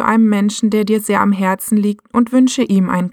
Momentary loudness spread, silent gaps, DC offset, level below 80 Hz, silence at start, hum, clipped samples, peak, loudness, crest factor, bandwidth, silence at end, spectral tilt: 4 LU; none; under 0.1%; -56 dBFS; 0 s; none; under 0.1%; 0 dBFS; -15 LUFS; 12 dB; 18 kHz; 0 s; -5.5 dB/octave